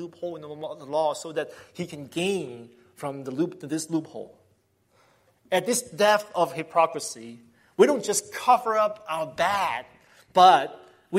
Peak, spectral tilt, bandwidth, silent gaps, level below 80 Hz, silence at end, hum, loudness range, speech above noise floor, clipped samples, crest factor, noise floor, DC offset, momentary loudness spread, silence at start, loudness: -4 dBFS; -3.5 dB/octave; 16 kHz; none; -72 dBFS; 0 s; none; 9 LU; 41 dB; under 0.1%; 20 dB; -66 dBFS; under 0.1%; 16 LU; 0 s; -24 LUFS